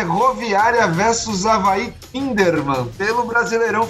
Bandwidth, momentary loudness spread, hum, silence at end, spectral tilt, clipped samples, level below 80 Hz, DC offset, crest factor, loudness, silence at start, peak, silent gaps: 15.5 kHz; 7 LU; none; 0 s; -4.5 dB/octave; under 0.1%; -44 dBFS; under 0.1%; 16 dB; -17 LUFS; 0 s; -2 dBFS; none